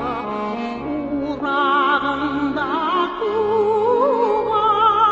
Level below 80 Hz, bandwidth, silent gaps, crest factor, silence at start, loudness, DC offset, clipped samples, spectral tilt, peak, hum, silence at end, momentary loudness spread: -48 dBFS; 7.8 kHz; none; 16 dB; 0 s; -19 LUFS; under 0.1%; under 0.1%; -6 dB/octave; -4 dBFS; none; 0 s; 9 LU